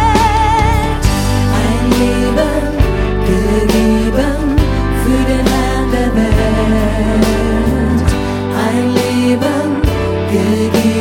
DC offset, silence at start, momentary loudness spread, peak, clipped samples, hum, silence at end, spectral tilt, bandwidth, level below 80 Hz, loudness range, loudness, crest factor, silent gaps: under 0.1%; 0 s; 3 LU; 0 dBFS; under 0.1%; none; 0 s; -6 dB/octave; 17.5 kHz; -18 dBFS; 1 LU; -13 LUFS; 12 dB; none